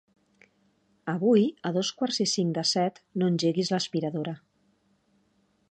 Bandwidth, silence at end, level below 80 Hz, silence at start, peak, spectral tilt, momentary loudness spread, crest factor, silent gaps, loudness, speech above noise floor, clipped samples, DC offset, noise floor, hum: 9.8 kHz; 1.35 s; -76 dBFS; 1.05 s; -10 dBFS; -5 dB/octave; 11 LU; 18 dB; none; -27 LUFS; 43 dB; under 0.1%; under 0.1%; -69 dBFS; none